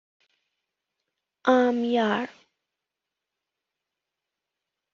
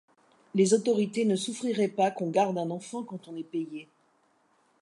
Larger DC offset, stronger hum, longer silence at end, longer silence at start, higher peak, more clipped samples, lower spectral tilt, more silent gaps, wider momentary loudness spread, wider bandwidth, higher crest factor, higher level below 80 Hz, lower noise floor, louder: neither; neither; first, 2.65 s vs 1 s; first, 1.45 s vs 0.55 s; first, -6 dBFS vs -10 dBFS; neither; second, -3 dB/octave vs -5.5 dB/octave; neither; second, 9 LU vs 15 LU; second, 7.2 kHz vs 11.5 kHz; about the same, 24 dB vs 20 dB; first, -76 dBFS vs -82 dBFS; first, -86 dBFS vs -68 dBFS; first, -24 LUFS vs -28 LUFS